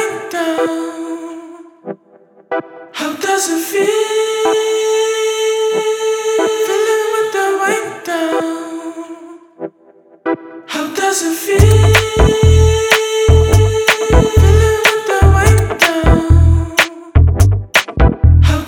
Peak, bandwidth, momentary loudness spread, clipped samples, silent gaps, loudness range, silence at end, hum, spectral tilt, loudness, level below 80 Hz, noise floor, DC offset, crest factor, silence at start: 0 dBFS; 18.5 kHz; 16 LU; under 0.1%; none; 10 LU; 0 s; none; -5 dB/octave; -13 LUFS; -20 dBFS; -46 dBFS; under 0.1%; 12 dB; 0 s